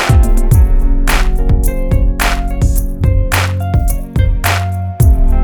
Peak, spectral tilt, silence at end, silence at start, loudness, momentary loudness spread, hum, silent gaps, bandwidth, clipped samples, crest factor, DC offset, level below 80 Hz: 0 dBFS; -5.5 dB/octave; 0 s; 0 s; -14 LUFS; 4 LU; none; none; 19.5 kHz; under 0.1%; 10 dB; under 0.1%; -12 dBFS